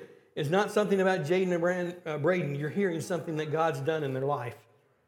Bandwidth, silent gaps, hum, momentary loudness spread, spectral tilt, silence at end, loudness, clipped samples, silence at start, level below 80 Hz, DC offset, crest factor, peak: 17 kHz; none; none; 8 LU; -6.5 dB/octave; 0.5 s; -29 LUFS; under 0.1%; 0 s; -80 dBFS; under 0.1%; 18 dB; -12 dBFS